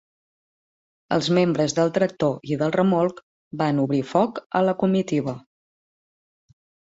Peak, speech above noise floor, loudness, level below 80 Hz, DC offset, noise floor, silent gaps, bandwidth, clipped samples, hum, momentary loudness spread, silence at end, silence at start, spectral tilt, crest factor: -6 dBFS; over 69 dB; -22 LUFS; -64 dBFS; under 0.1%; under -90 dBFS; 3.23-3.51 s, 4.46-4.50 s; 8 kHz; under 0.1%; none; 6 LU; 1.45 s; 1.1 s; -6.5 dB/octave; 18 dB